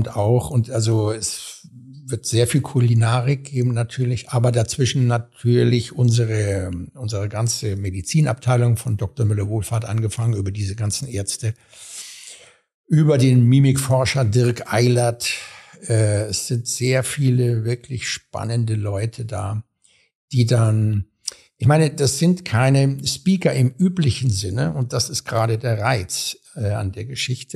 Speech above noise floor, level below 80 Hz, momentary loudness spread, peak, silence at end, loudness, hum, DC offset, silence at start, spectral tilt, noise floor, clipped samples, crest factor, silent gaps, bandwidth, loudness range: 25 dB; -50 dBFS; 11 LU; -4 dBFS; 0 s; -20 LUFS; none; under 0.1%; 0 s; -5.5 dB/octave; -44 dBFS; under 0.1%; 16 dB; 12.74-12.84 s, 20.15-20.28 s; 13.5 kHz; 5 LU